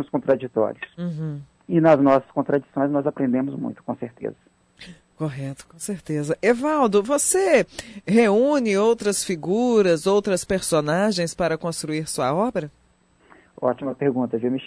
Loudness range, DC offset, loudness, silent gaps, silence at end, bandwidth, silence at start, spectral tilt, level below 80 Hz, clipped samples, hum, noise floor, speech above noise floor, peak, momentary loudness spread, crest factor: 7 LU; under 0.1%; -22 LUFS; none; 0 s; 11 kHz; 0 s; -5 dB/octave; -56 dBFS; under 0.1%; none; -59 dBFS; 38 dB; -6 dBFS; 14 LU; 16 dB